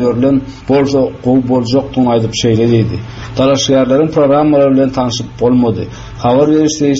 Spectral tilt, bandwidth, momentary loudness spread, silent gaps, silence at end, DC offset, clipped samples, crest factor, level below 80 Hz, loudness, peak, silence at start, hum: -6 dB/octave; 7.8 kHz; 7 LU; none; 0 s; under 0.1%; under 0.1%; 10 dB; -36 dBFS; -12 LUFS; 0 dBFS; 0 s; none